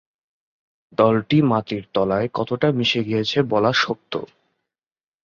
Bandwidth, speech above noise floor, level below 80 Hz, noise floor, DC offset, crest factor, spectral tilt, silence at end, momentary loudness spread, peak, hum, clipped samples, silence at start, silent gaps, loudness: 7.2 kHz; over 70 dB; -56 dBFS; under -90 dBFS; under 0.1%; 18 dB; -6 dB/octave; 1 s; 9 LU; -4 dBFS; none; under 0.1%; 1 s; none; -20 LUFS